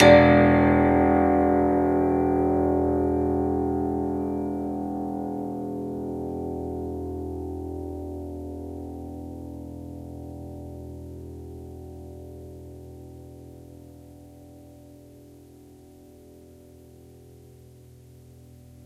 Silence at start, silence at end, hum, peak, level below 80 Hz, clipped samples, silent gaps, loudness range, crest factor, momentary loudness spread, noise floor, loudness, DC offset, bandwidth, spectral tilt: 0 s; 1.55 s; none; -2 dBFS; -42 dBFS; under 0.1%; none; 25 LU; 24 dB; 23 LU; -49 dBFS; -24 LUFS; under 0.1%; 11.5 kHz; -7.5 dB/octave